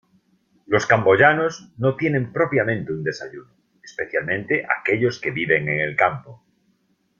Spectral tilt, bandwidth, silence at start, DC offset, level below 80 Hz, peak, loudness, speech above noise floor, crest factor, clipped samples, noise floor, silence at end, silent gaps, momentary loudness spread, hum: -6 dB/octave; 7.4 kHz; 0.7 s; under 0.1%; -60 dBFS; -2 dBFS; -20 LUFS; 45 dB; 20 dB; under 0.1%; -66 dBFS; 0.85 s; none; 12 LU; none